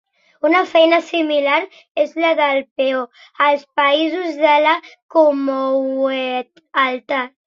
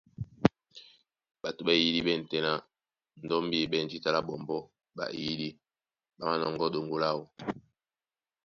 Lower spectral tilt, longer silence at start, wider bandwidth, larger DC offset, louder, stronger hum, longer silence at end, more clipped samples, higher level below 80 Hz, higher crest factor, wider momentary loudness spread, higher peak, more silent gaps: second, -3 dB/octave vs -5.5 dB/octave; first, 0.45 s vs 0.2 s; about the same, 7.4 kHz vs 7 kHz; neither; first, -17 LUFS vs -31 LUFS; neither; second, 0.2 s vs 0.85 s; neither; second, -72 dBFS vs -64 dBFS; second, 16 dB vs 26 dB; second, 9 LU vs 13 LU; first, -2 dBFS vs -8 dBFS; first, 1.91-1.95 s, 2.71-2.76 s, 5.02-5.09 s vs none